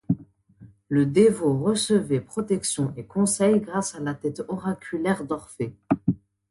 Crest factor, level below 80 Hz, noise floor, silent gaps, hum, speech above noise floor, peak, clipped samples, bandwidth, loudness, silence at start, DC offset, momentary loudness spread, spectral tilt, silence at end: 18 dB; -58 dBFS; -51 dBFS; none; none; 28 dB; -6 dBFS; under 0.1%; 11.5 kHz; -25 LUFS; 0.1 s; under 0.1%; 11 LU; -5.5 dB/octave; 0.35 s